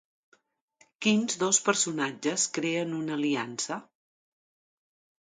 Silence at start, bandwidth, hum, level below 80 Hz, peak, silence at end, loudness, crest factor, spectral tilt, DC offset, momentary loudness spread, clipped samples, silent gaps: 1 s; 9.6 kHz; none; -80 dBFS; -8 dBFS; 1.4 s; -28 LUFS; 22 dB; -2.5 dB/octave; under 0.1%; 9 LU; under 0.1%; none